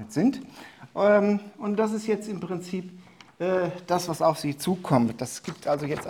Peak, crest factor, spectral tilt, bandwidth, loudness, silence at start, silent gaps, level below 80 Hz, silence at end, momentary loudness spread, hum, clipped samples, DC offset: -6 dBFS; 20 dB; -6 dB/octave; 17.5 kHz; -26 LUFS; 0 s; none; -64 dBFS; 0 s; 14 LU; none; under 0.1%; under 0.1%